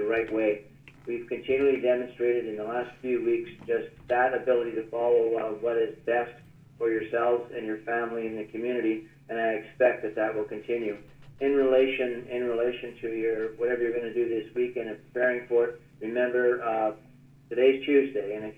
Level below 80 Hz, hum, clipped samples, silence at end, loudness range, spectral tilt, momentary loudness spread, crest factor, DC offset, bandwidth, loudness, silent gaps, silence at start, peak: -64 dBFS; none; under 0.1%; 0.05 s; 3 LU; -7 dB/octave; 10 LU; 18 dB; under 0.1%; 4.3 kHz; -28 LUFS; none; 0 s; -10 dBFS